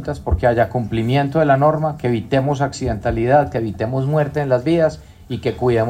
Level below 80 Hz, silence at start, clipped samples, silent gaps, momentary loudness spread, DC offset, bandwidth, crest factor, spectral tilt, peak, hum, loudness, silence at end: -34 dBFS; 0 s; under 0.1%; none; 7 LU; under 0.1%; 14 kHz; 16 dB; -7.5 dB/octave; -2 dBFS; none; -18 LUFS; 0 s